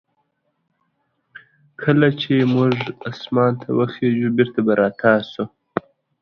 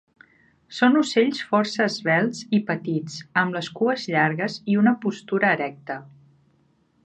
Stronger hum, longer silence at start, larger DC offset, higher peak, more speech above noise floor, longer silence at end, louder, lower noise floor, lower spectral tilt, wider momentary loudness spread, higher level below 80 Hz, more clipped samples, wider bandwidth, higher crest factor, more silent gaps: neither; first, 1.8 s vs 0.7 s; neither; first, 0 dBFS vs -6 dBFS; first, 52 dB vs 41 dB; second, 0.4 s vs 0.95 s; first, -19 LUFS vs -22 LUFS; first, -70 dBFS vs -63 dBFS; first, -8.5 dB/octave vs -5.5 dB/octave; first, 13 LU vs 9 LU; first, -60 dBFS vs -70 dBFS; neither; second, 6.4 kHz vs 9.2 kHz; about the same, 20 dB vs 18 dB; neither